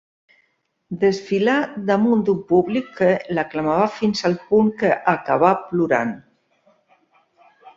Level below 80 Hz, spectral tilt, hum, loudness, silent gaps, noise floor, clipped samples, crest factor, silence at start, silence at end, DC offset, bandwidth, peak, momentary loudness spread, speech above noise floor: -60 dBFS; -6.5 dB/octave; none; -19 LUFS; none; -68 dBFS; under 0.1%; 18 dB; 0.9 s; 0.1 s; under 0.1%; 7.6 kHz; -2 dBFS; 5 LU; 49 dB